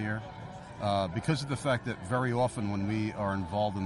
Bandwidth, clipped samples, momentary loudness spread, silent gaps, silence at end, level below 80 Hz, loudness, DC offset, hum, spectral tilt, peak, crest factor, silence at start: 11.5 kHz; under 0.1%; 7 LU; none; 0 s; -56 dBFS; -32 LUFS; under 0.1%; none; -6.5 dB/octave; -16 dBFS; 16 dB; 0 s